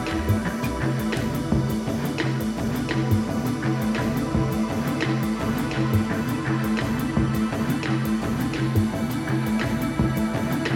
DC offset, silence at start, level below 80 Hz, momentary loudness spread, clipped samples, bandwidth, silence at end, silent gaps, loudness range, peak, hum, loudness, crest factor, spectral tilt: under 0.1%; 0 s; -38 dBFS; 2 LU; under 0.1%; 19 kHz; 0 s; none; 1 LU; -10 dBFS; none; -24 LUFS; 14 dB; -6.5 dB/octave